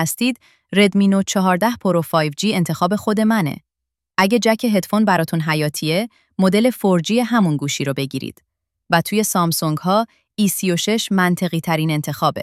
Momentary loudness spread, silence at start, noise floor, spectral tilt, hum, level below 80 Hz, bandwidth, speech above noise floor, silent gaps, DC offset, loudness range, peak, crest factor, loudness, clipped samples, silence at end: 6 LU; 0 s; -83 dBFS; -5 dB/octave; none; -60 dBFS; 16 kHz; 66 dB; none; under 0.1%; 2 LU; -2 dBFS; 18 dB; -18 LUFS; under 0.1%; 0 s